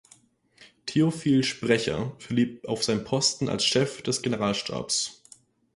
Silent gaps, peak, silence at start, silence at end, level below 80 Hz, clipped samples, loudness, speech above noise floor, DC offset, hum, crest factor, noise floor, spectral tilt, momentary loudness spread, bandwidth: none; -8 dBFS; 0.6 s; 0.65 s; -58 dBFS; under 0.1%; -26 LUFS; 34 dB; under 0.1%; none; 20 dB; -59 dBFS; -4 dB/octave; 6 LU; 11.5 kHz